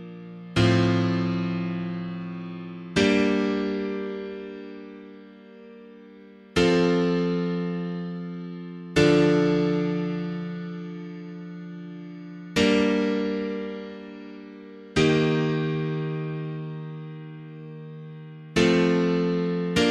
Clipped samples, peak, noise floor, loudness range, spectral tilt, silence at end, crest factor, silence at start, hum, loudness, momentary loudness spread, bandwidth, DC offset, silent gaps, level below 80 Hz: under 0.1%; -6 dBFS; -48 dBFS; 5 LU; -6.5 dB/octave; 0 s; 20 dB; 0 s; none; -25 LUFS; 20 LU; 11.5 kHz; under 0.1%; none; -52 dBFS